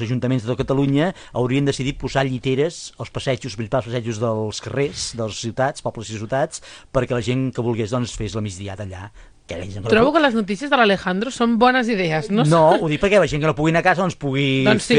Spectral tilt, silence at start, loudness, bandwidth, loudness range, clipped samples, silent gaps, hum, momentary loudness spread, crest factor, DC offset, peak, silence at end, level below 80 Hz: -5.5 dB/octave; 0 s; -20 LUFS; 10 kHz; 7 LU; under 0.1%; none; none; 13 LU; 18 dB; under 0.1%; -2 dBFS; 0 s; -44 dBFS